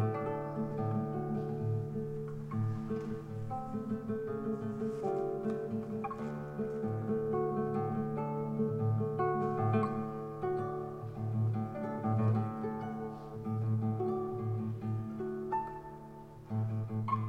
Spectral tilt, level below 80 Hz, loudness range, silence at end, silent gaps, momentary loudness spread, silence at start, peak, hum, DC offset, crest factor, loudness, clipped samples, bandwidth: -10 dB/octave; -62 dBFS; 4 LU; 0 s; none; 8 LU; 0 s; -20 dBFS; none; under 0.1%; 16 dB; -36 LUFS; under 0.1%; 5.4 kHz